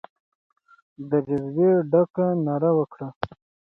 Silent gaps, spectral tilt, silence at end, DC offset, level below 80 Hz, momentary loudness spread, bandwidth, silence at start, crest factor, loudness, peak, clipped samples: 2.10-2.14 s, 3.16-3.21 s; -11 dB/octave; 0.4 s; under 0.1%; -62 dBFS; 14 LU; 5.6 kHz; 1 s; 18 dB; -23 LUFS; -6 dBFS; under 0.1%